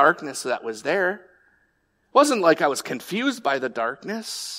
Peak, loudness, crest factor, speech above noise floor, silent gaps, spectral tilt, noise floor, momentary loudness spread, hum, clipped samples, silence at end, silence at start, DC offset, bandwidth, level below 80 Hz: -4 dBFS; -23 LUFS; 20 dB; 45 dB; none; -3 dB/octave; -68 dBFS; 10 LU; none; under 0.1%; 0 s; 0 s; under 0.1%; 16 kHz; -74 dBFS